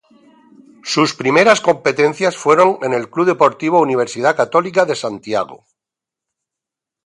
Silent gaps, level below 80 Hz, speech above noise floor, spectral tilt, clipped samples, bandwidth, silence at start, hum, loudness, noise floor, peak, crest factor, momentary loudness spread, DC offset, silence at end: none; -64 dBFS; 71 dB; -4.5 dB/octave; under 0.1%; 11.5 kHz; 0.85 s; none; -15 LUFS; -85 dBFS; 0 dBFS; 16 dB; 9 LU; under 0.1%; 1.5 s